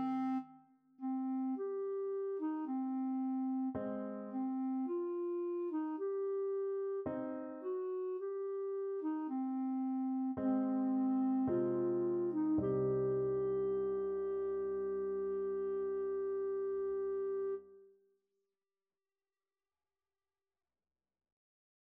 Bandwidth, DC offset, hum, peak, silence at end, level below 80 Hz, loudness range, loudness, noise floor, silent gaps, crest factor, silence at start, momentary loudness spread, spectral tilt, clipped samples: 3.3 kHz; under 0.1%; none; -24 dBFS; 4.1 s; -72 dBFS; 5 LU; -38 LUFS; under -90 dBFS; none; 14 dB; 0 s; 6 LU; -9.5 dB/octave; under 0.1%